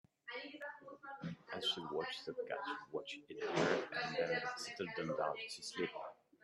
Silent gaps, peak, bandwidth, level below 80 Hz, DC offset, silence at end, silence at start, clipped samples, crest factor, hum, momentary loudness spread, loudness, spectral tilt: none; -22 dBFS; 12.5 kHz; -82 dBFS; under 0.1%; 0.3 s; 0.25 s; under 0.1%; 20 dB; none; 13 LU; -42 LUFS; -4 dB/octave